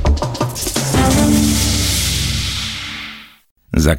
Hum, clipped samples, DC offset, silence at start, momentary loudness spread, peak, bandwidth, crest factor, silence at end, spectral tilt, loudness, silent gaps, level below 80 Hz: none; under 0.1%; under 0.1%; 0 s; 12 LU; -2 dBFS; 17 kHz; 14 dB; 0 s; -4 dB/octave; -16 LUFS; 3.51-3.55 s; -22 dBFS